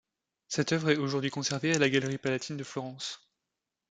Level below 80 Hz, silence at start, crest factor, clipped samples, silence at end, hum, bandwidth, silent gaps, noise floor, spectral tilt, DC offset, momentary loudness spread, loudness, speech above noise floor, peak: -70 dBFS; 0.5 s; 22 dB; under 0.1%; 0.75 s; none; 9.6 kHz; none; -87 dBFS; -4.5 dB/octave; under 0.1%; 12 LU; -30 LUFS; 57 dB; -10 dBFS